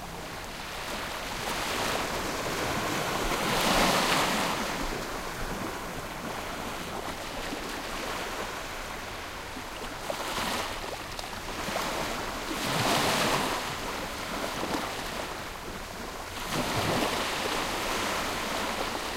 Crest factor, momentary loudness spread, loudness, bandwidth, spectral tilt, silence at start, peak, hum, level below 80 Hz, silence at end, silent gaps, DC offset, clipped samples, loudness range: 20 dB; 12 LU; -31 LUFS; 16 kHz; -3 dB/octave; 0 s; -12 dBFS; none; -46 dBFS; 0 s; none; under 0.1%; under 0.1%; 7 LU